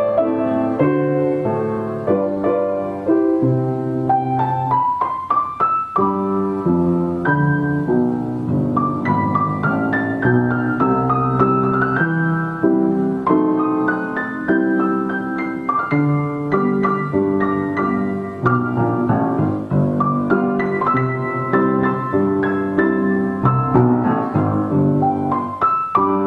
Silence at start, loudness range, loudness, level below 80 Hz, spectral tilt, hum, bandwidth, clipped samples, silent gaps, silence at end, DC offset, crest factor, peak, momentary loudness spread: 0 s; 2 LU; -18 LUFS; -50 dBFS; -10 dB/octave; none; 5.2 kHz; under 0.1%; none; 0 s; under 0.1%; 16 dB; 0 dBFS; 4 LU